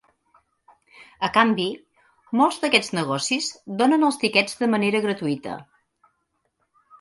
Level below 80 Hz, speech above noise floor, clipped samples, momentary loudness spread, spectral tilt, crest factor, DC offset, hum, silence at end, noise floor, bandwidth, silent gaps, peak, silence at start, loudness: -66 dBFS; 51 dB; under 0.1%; 10 LU; -4 dB/octave; 22 dB; under 0.1%; none; 1.4 s; -73 dBFS; 11.5 kHz; none; -2 dBFS; 1 s; -22 LUFS